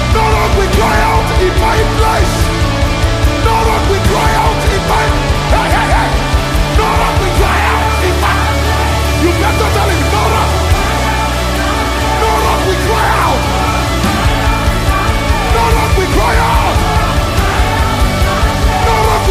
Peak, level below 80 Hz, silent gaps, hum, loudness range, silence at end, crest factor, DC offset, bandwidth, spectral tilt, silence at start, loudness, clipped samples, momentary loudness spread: 0 dBFS; -16 dBFS; none; none; 1 LU; 0 s; 10 dB; under 0.1%; 15.5 kHz; -5 dB/octave; 0 s; -12 LUFS; under 0.1%; 2 LU